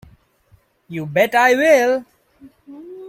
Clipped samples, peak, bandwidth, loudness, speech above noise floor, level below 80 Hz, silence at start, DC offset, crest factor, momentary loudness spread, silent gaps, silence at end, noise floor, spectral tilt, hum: under 0.1%; -2 dBFS; 16.5 kHz; -15 LUFS; 41 dB; -60 dBFS; 0.9 s; under 0.1%; 18 dB; 18 LU; none; 0 s; -56 dBFS; -4.5 dB/octave; none